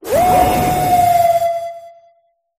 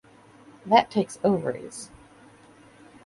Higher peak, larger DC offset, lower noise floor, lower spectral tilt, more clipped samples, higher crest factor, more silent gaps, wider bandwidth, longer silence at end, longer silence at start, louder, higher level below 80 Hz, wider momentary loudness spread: first, 0 dBFS vs -6 dBFS; neither; first, -58 dBFS vs -53 dBFS; about the same, -5 dB/octave vs -5 dB/octave; neither; second, 14 dB vs 22 dB; neither; first, 15.5 kHz vs 11.5 kHz; second, 0.7 s vs 1.2 s; second, 0.05 s vs 0.65 s; first, -14 LUFS vs -24 LUFS; first, -36 dBFS vs -64 dBFS; second, 10 LU vs 22 LU